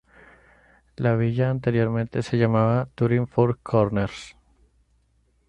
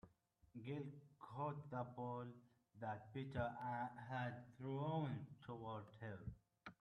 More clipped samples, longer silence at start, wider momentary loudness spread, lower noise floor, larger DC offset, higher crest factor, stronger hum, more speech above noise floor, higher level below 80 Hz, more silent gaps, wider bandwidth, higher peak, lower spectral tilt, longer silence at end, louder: neither; first, 1 s vs 0.05 s; second, 6 LU vs 12 LU; second, -65 dBFS vs -75 dBFS; neither; about the same, 18 dB vs 20 dB; neither; first, 43 dB vs 27 dB; first, -52 dBFS vs -74 dBFS; neither; about the same, 9 kHz vs 9.2 kHz; first, -6 dBFS vs -30 dBFS; about the same, -8.5 dB/octave vs -8.5 dB/octave; first, 1.15 s vs 0.1 s; first, -23 LUFS vs -50 LUFS